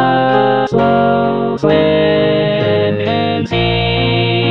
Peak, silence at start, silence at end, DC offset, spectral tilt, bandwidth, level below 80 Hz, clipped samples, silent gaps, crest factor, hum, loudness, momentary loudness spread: 0 dBFS; 0 s; 0 s; 0.7%; -8 dB/octave; 7.2 kHz; -36 dBFS; under 0.1%; none; 12 dB; none; -13 LUFS; 3 LU